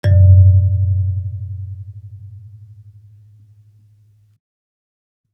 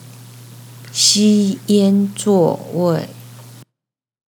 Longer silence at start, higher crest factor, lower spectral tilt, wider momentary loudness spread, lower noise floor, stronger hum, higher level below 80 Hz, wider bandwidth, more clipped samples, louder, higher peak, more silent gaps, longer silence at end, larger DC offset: second, 0.05 s vs 0.2 s; about the same, 16 dB vs 18 dB; first, -10 dB/octave vs -4.5 dB/octave; first, 28 LU vs 10 LU; second, -52 dBFS vs -85 dBFS; neither; first, -46 dBFS vs -76 dBFS; second, 3.4 kHz vs 19 kHz; neither; about the same, -13 LUFS vs -15 LUFS; about the same, -2 dBFS vs 0 dBFS; neither; first, 2.95 s vs 0.85 s; neither